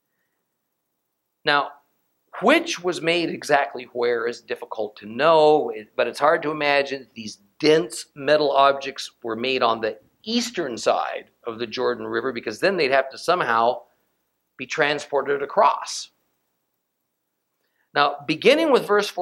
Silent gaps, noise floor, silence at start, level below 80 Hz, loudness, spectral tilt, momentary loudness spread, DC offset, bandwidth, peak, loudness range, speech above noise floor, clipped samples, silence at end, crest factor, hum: none; -77 dBFS; 1.45 s; -70 dBFS; -22 LUFS; -3.5 dB/octave; 13 LU; under 0.1%; 15.5 kHz; -2 dBFS; 4 LU; 55 dB; under 0.1%; 0 s; 20 dB; none